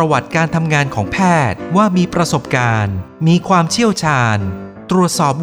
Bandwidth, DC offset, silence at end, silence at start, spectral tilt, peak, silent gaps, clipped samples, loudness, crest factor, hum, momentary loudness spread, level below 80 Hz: 14.5 kHz; under 0.1%; 0 s; 0 s; -5.5 dB/octave; 0 dBFS; none; under 0.1%; -15 LUFS; 14 dB; none; 5 LU; -42 dBFS